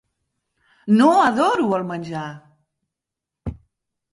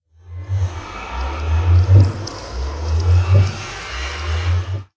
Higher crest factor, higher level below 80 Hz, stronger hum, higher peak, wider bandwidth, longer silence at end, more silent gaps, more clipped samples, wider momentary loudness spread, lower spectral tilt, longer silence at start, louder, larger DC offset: about the same, 20 dB vs 18 dB; second, -48 dBFS vs -22 dBFS; neither; about the same, -2 dBFS vs 0 dBFS; first, 11.5 kHz vs 8 kHz; first, 0.6 s vs 0.1 s; neither; neither; first, 20 LU vs 15 LU; about the same, -6 dB/octave vs -6 dB/octave; first, 0.85 s vs 0.25 s; about the same, -18 LUFS vs -19 LUFS; neither